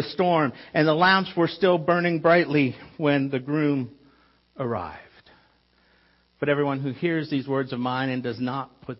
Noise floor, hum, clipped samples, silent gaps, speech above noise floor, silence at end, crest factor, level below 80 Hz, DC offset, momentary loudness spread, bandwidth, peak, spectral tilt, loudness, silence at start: -62 dBFS; none; under 0.1%; none; 39 dB; 0.05 s; 18 dB; -64 dBFS; under 0.1%; 11 LU; 5.8 kHz; -6 dBFS; -10 dB/octave; -24 LUFS; 0 s